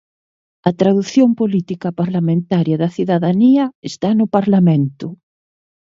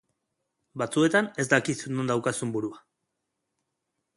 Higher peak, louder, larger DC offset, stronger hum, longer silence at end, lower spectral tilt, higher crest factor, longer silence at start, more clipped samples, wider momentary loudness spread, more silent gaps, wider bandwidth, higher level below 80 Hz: first, 0 dBFS vs -4 dBFS; first, -16 LUFS vs -26 LUFS; neither; neither; second, 0.8 s vs 1.4 s; first, -8 dB/octave vs -4.5 dB/octave; second, 16 dB vs 24 dB; about the same, 0.65 s vs 0.75 s; neither; about the same, 9 LU vs 11 LU; first, 3.75-3.82 s vs none; second, 7.6 kHz vs 11.5 kHz; first, -60 dBFS vs -70 dBFS